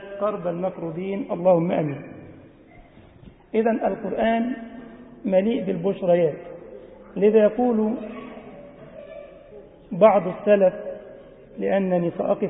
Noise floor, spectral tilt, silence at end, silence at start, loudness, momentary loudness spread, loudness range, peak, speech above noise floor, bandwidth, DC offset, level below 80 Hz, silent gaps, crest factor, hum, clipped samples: -49 dBFS; -12 dB/octave; 0 s; 0 s; -22 LUFS; 24 LU; 4 LU; -2 dBFS; 28 dB; 3.9 kHz; under 0.1%; -58 dBFS; none; 20 dB; none; under 0.1%